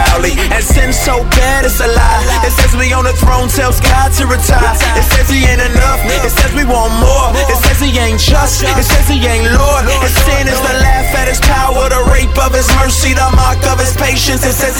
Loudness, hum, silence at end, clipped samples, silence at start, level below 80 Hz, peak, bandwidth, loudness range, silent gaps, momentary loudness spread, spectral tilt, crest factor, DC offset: -10 LUFS; none; 0 s; under 0.1%; 0 s; -12 dBFS; 0 dBFS; 19 kHz; 0 LU; none; 2 LU; -4 dB/octave; 8 dB; under 0.1%